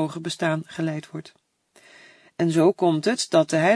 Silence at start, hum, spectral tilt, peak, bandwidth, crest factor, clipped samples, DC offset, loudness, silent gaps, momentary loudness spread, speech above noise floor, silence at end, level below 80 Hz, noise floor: 0 s; none; -5.5 dB/octave; -4 dBFS; 11 kHz; 20 dB; under 0.1%; under 0.1%; -23 LUFS; none; 17 LU; 34 dB; 0 s; -72 dBFS; -56 dBFS